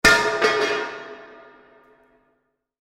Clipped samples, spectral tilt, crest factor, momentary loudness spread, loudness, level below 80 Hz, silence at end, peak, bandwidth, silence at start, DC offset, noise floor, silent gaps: under 0.1%; -2 dB/octave; 22 dB; 23 LU; -20 LUFS; -46 dBFS; 1.6 s; -2 dBFS; 16 kHz; 0.05 s; under 0.1%; -71 dBFS; none